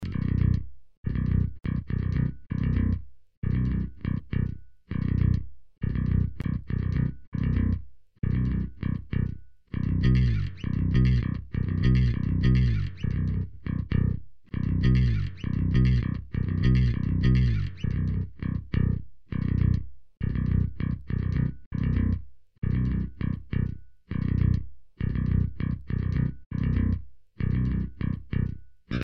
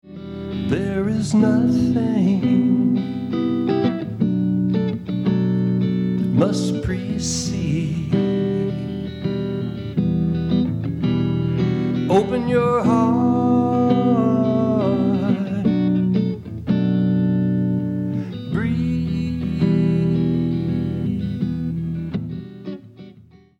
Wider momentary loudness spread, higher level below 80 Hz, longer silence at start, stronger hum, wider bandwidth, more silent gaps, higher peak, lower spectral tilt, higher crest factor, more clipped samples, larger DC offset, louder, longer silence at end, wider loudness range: first, 11 LU vs 8 LU; first, -32 dBFS vs -46 dBFS; about the same, 0 s vs 0.05 s; neither; second, 6 kHz vs 11 kHz; first, 0.97-1.04 s, 3.37-3.42 s, 7.27-7.32 s, 21.66-21.71 s, 22.58-22.62 s, 26.46-26.50 s vs none; second, -12 dBFS vs -4 dBFS; first, -9.5 dB/octave vs -7.5 dB/octave; about the same, 14 dB vs 16 dB; neither; neither; second, -28 LUFS vs -20 LUFS; second, 0 s vs 0.45 s; about the same, 4 LU vs 4 LU